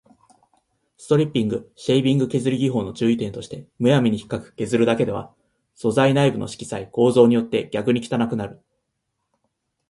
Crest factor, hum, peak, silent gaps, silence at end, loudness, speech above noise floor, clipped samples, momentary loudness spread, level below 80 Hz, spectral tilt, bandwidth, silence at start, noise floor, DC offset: 20 dB; none; -2 dBFS; none; 1.35 s; -21 LUFS; 56 dB; under 0.1%; 13 LU; -56 dBFS; -6.5 dB/octave; 11.5 kHz; 1 s; -76 dBFS; under 0.1%